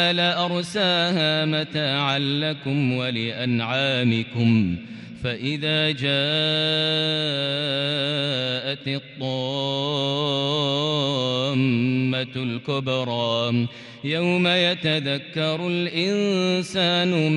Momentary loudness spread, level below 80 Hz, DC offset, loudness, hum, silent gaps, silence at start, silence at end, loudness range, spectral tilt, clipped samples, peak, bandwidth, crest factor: 6 LU; -62 dBFS; under 0.1%; -22 LUFS; none; none; 0 s; 0 s; 2 LU; -5.5 dB/octave; under 0.1%; -8 dBFS; 11.5 kHz; 14 dB